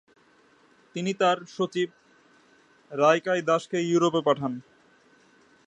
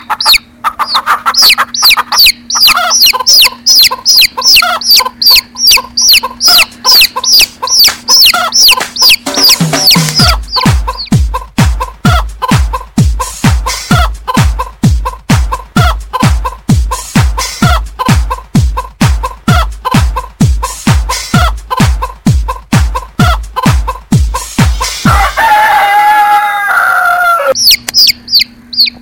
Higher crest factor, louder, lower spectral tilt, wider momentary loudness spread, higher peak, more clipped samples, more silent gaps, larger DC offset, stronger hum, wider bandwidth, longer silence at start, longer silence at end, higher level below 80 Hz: first, 22 dB vs 8 dB; second, -25 LUFS vs -7 LUFS; first, -5 dB/octave vs -2.5 dB/octave; about the same, 11 LU vs 9 LU; second, -6 dBFS vs 0 dBFS; second, under 0.1% vs 1%; neither; neither; neither; second, 9.4 kHz vs over 20 kHz; first, 0.95 s vs 0 s; first, 1.05 s vs 0.05 s; second, -76 dBFS vs -18 dBFS